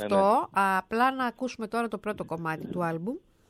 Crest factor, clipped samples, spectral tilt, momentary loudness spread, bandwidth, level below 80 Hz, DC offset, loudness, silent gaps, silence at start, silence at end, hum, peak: 16 dB; under 0.1%; -6 dB/octave; 11 LU; 15 kHz; -64 dBFS; under 0.1%; -28 LUFS; none; 0 s; 0.3 s; none; -12 dBFS